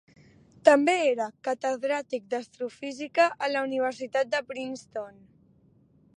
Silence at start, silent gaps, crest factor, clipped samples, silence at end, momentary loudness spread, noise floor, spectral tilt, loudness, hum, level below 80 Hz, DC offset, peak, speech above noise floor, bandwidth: 0.65 s; none; 24 dB; under 0.1%; 1.1 s; 15 LU; -61 dBFS; -3.5 dB/octave; -27 LUFS; none; -76 dBFS; under 0.1%; -4 dBFS; 34 dB; 11 kHz